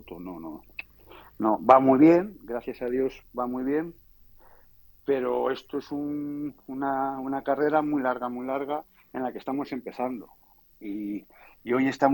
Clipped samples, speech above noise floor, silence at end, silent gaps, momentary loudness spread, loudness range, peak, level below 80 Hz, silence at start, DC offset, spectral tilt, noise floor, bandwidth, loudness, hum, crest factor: under 0.1%; 29 dB; 0 s; none; 20 LU; 9 LU; -4 dBFS; -60 dBFS; 0.05 s; under 0.1%; -7.5 dB/octave; -55 dBFS; 19 kHz; -26 LUFS; none; 24 dB